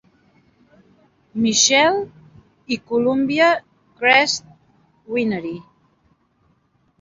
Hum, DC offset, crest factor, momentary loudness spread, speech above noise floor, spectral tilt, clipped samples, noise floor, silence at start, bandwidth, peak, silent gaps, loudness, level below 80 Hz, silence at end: none; under 0.1%; 20 dB; 15 LU; 44 dB; -2 dB/octave; under 0.1%; -62 dBFS; 1.35 s; 7.8 kHz; -2 dBFS; none; -18 LUFS; -62 dBFS; 1.4 s